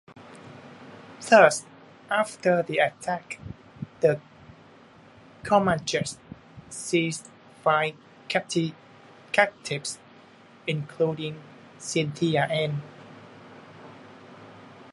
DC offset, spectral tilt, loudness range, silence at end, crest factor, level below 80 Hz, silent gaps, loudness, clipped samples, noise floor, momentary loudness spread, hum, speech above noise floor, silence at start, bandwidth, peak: under 0.1%; -4.5 dB/octave; 5 LU; 0.1 s; 26 dB; -62 dBFS; none; -25 LUFS; under 0.1%; -52 dBFS; 24 LU; none; 28 dB; 0.15 s; 11.5 kHz; -2 dBFS